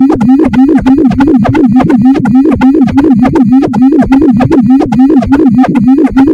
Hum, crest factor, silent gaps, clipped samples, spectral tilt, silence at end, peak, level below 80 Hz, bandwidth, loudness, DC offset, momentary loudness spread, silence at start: none; 4 dB; none; 8%; -8.5 dB/octave; 0 s; 0 dBFS; -28 dBFS; 7.2 kHz; -6 LUFS; under 0.1%; 1 LU; 0 s